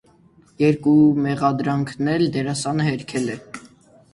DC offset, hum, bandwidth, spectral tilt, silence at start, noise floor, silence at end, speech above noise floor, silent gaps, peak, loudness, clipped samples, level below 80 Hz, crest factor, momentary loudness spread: under 0.1%; none; 11.5 kHz; -6.5 dB/octave; 0.6 s; -53 dBFS; 0.5 s; 34 dB; none; -4 dBFS; -20 LUFS; under 0.1%; -56 dBFS; 16 dB; 12 LU